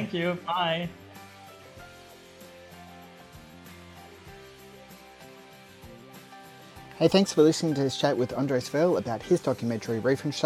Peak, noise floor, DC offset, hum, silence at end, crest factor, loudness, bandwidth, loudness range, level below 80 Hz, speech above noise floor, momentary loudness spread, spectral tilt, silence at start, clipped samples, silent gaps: -8 dBFS; -50 dBFS; under 0.1%; none; 0 s; 22 dB; -26 LUFS; 16 kHz; 22 LU; -62 dBFS; 24 dB; 26 LU; -5.5 dB/octave; 0 s; under 0.1%; none